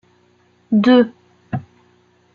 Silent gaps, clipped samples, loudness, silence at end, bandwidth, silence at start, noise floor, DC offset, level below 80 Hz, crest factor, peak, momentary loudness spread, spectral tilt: none; under 0.1%; -17 LUFS; 0.75 s; 6.8 kHz; 0.7 s; -56 dBFS; under 0.1%; -60 dBFS; 18 dB; -2 dBFS; 16 LU; -8 dB/octave